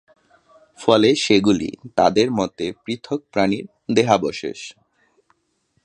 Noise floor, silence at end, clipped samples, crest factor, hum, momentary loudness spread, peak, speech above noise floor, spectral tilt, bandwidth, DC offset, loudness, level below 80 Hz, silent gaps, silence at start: -68 dBFS; 1.15 s; under 0.1%; 20 dB; none; 14 LU; 0 dBFS; 49 dB; -5 dB/octave; 10.5 kHz; under 0.1%; -19 LUFS; -54 dBFS; none; 0.8 s